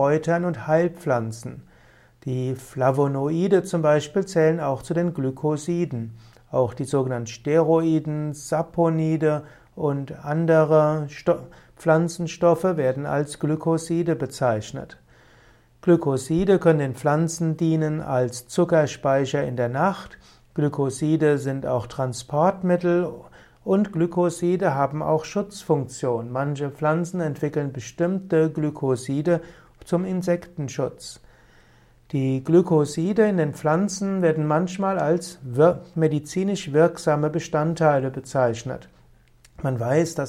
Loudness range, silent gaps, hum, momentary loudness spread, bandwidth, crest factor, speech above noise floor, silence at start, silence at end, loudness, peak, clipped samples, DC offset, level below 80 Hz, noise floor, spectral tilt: 3 LU; none; none; 9 LU; 13.5 kHz; 18 dB; 33 dB; 0 s; 0 s; -23 LUFS; -6 dBFS; under 0.1%; under 0.1%; -56 dBFS; -55 dBFS; -7 dB/octave